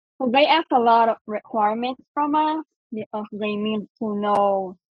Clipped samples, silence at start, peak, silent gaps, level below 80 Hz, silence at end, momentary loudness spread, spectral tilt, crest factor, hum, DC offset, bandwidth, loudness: under 0.1%; 0.2 s; -6 dBFS; 1.21-1.25 s, 2.08-2.14 s, 2.76-2.90 s, 3.06-3.11 s, 3.90-3.95 s; -70 dBFS; 0.2 s; 13 LU; -7 dB/octave; 16 dB; none; under 0.1%; 9.8 kHz; -22 LUFS